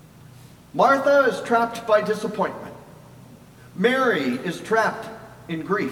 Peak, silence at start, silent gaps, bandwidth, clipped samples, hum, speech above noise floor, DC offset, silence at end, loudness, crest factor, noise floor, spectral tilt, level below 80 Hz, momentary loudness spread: -6 dBFS; 0.75 s; none; 17.5 kHz; under 0.1%; none; 25 dB; under 0.1%; 0 s; -21 LUFS; 18 dB; -46 dBFS; -5.5 dB/octave; -62 dBFS; 19 LU